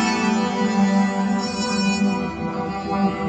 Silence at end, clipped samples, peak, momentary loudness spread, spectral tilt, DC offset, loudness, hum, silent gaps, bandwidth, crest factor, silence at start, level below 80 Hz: 0 s; under 0.1%; -8 dBFS; 7 LU; -5.5 dB/octave; under 0.1%; -21 LUFS; none; none; 9 kHz; 12 dB; 0 s; -50 dBFS